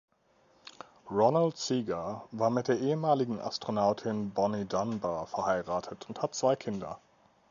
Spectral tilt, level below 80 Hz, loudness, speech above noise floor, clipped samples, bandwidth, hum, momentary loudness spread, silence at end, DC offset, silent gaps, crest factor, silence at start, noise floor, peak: -5.5 dB/octave; -66 dBFS; -31 LUFS; 36 dB; under 0.1%; 7.6 kHz; none; 11 LU; 0.55 s; under 0.1%; none; 20 dB; 0.65 s; -67 dBFS; -12 dBFS